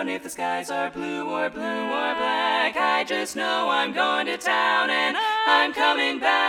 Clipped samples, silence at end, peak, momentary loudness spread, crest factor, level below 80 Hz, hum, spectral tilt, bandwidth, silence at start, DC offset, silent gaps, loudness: under 0.1%; 0 s; -4 dBFS; 9 LU; 20 dB; -66 dBFS; none; -2 dB/octave; 16 kHz; 0 s; under 0.1%; none; -23 LUFS